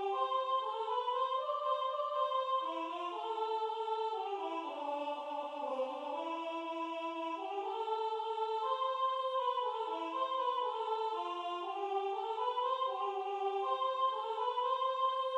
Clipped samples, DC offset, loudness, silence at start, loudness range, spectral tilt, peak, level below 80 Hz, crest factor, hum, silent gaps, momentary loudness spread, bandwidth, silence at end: under 0.1%; under 0.1%; -37 LUFS; 0 s; 3 LU; -1.5 dB/octave; -22 dBFS; under -90 dBFS; 14 dB; none; none; 5 LU; 9.6 kHz; 0 s